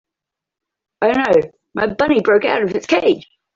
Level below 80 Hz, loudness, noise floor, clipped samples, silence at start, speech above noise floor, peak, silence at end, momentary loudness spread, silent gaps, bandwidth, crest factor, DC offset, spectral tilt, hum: -52 dBFS; -16 LUFS; -84 dBFS; under 0.1%; 1 s; 69 dB; -2 dBFS; 0.35 s; 8 LU; none; 7.6 kHz; 16 dB; under 0.1%; -5.5 dB/octave; none